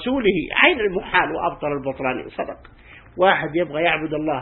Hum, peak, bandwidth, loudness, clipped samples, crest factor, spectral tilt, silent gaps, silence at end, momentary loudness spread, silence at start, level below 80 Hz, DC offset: none; 0 dBFS; 4.2 kHz; -20 LUFS; under 0.1%; 22 dB; -9.5 dB/octave; none; 0 s; 15 LU; 0 s; -48 dBFS; under 0.1%